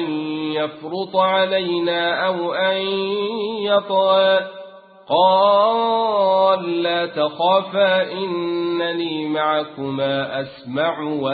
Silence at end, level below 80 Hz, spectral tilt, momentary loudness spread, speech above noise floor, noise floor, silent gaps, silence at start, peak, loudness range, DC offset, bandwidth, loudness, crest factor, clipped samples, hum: 0 s; -64 dBFS; -10 dB/octave; 8 LU; 21 dB; -40 dBFS; none; 0 s; -4 dBFS; 3 LU; under 0.1%; 4.8 kHz; -19 LUFS; 16 dB; under 0.1%; none